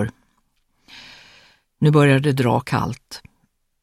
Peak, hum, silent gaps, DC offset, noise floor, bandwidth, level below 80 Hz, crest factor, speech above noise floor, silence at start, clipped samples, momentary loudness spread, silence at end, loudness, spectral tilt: -4 dBFS; none; none; under 0.1%; -66 dBFS; 15 kHz; -52 dBFS; 18 dB; 49 dB; 0 s; under 0.1%; 26 LU; 0.65 s; -18 LUFS; -7 dB/octave